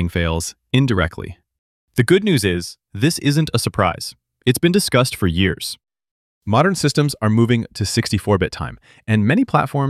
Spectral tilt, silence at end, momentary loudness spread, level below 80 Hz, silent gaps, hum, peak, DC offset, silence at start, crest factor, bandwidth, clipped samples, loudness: -5.5 dB/octave; 0 s; 13 LU; -40 dBFS; 1.59-1.88 s, 6.11-6.42 s; none; -2 dBFS; under 0.1%; 0 s; 18 dB; 15.5 kHz; under 0.1%; -18 LUFS